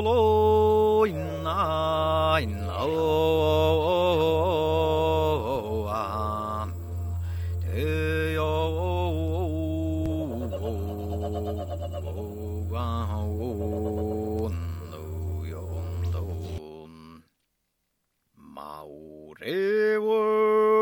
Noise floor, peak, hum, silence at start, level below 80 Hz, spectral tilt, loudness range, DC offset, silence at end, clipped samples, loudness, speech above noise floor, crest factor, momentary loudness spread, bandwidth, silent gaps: -77 dBFS; -10 dBFS; none; 0 s; -40 dBFS; -7 dB/octave; 12 LU; under 0.1%; 0 s; under 0.1%; -26 LUFS; 53 dB; 16 dB; 13 LU; 19.5 kHz; none